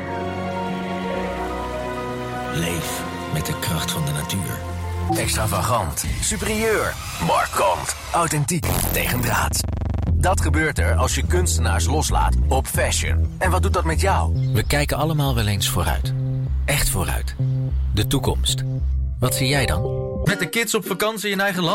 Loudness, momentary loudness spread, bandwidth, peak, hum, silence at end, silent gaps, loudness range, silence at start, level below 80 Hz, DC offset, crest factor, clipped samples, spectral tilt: -21 LUFS; 7 LU; 16.5 kHz; -10 dBFS; none; 0 s; none; 5 LU; 0 s; -28 dBFS; under 0.1%; 12 dB; under 0.1%; -4.5 dB/octave